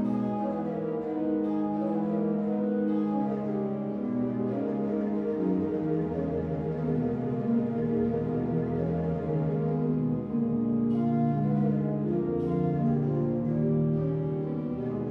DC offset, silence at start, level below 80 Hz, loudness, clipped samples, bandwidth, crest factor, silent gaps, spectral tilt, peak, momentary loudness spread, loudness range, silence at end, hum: under 0.1%; 0 s; -56 dBFS; -29 LUFS; under 0.1%; 4.4 kHz; 12 dB; none; -11.5 dB/octave; -16 dBFS; 4 LU; 2 LU; 0 s; none